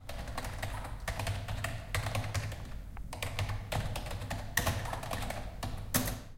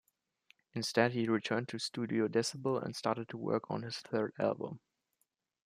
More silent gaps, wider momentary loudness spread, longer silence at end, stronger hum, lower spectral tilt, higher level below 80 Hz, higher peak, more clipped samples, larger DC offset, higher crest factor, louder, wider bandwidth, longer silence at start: neither; about the same, 9 LU vs 9 LU; second, 0 s vs 0.9 s; neither; about the same, -4 dB/octave vs -5 dB/octave; first, -44 dBFS vs -80 dBFS; about the same, -14 dBFS vs -14 dBFS; neither; neither; about the same, 24 dB vs 22 dB; about the same, -37 LUFS vs -35 LUFS; first, 17 kHz vs 15 kHz; second, 0 s vs 0.75 s